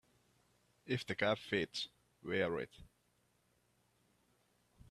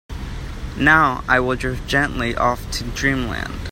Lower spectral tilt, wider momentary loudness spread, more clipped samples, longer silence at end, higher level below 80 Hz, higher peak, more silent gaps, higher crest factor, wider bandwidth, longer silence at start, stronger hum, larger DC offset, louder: about the same, -5 dB/octave vs -5 dB/octave; second, 11 LU vs 17 LU; neither; first, 2.05 s vs 0 s; second, -72 dBFS vs -32 dBFS; second, -20 dBFS vs 0 dBFS; neither; about the same, 24 dB vs 20 dB; second, 14 kHz vs 16 kHz; first, 0.85 s vs 0.1 s; first, 60 Hz at -70 dBFS vs none; neither; second, -39 LUFS vs -19 LUFS